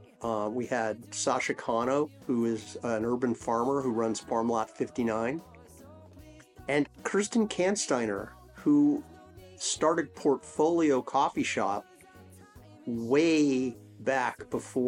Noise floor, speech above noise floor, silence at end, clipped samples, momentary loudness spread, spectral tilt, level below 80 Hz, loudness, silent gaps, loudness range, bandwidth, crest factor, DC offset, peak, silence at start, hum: -53 dBFS; 24 dB; 0 s; under 0.1%; 10 LU; -4.5 dB/octave; -64 dBFS; -29 LUFS; none; 4 LU; 12.5 kHz; 16 dB; under 0.1%; -12 dBFS; 0.2 s; none